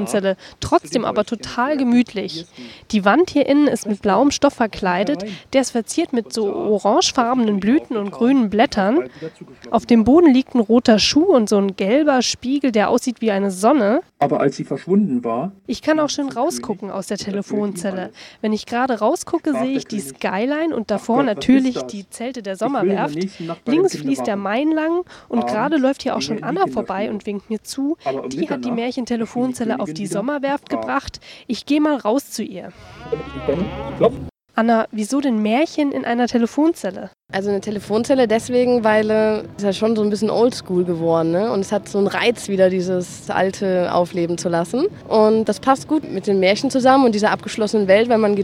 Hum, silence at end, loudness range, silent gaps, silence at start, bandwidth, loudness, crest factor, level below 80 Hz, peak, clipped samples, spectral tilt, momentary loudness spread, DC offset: none; 0 s; 6 LU; none; 0 s; 15 kHz; -19 LUFS; 18 dB; -50 dBFS; 0 dBFS; under 0.1%; -5 dB/octave; 11 LU; under 0.1%